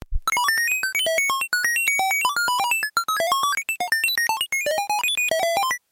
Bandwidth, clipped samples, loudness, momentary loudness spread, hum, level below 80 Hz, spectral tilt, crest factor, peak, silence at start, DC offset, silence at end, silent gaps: 17 kHz; under 0.1%; -21 LUFS; 3 LU; none; -40 dBFS; 0.5 dB/octave; 14 dB; -10 dBFS; 0 s; under 0.1%; 0.15 s; none